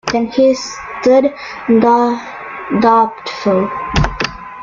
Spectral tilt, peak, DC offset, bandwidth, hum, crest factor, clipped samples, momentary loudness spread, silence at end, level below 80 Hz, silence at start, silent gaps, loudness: -5.5 dB/octave; -2 dBFS; under 0.1%; 7.6 kHz; none; 12 dB; under 0.1%; 12 LU; 0 s; -32 dBFS; 0.05 s; none; -14 LUFS